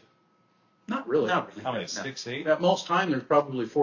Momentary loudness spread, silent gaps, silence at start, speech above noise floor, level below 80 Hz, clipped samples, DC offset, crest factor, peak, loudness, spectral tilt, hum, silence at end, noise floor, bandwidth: 9 LU; none; 0.9 s; 40 dB; -72 dBFS; under 0.1%; under 0.1%; 20 dB; -8 dBFS; -27 LUFS; -5 dB/octave; none; 0 s; -66 dBFS; 7.4 kHz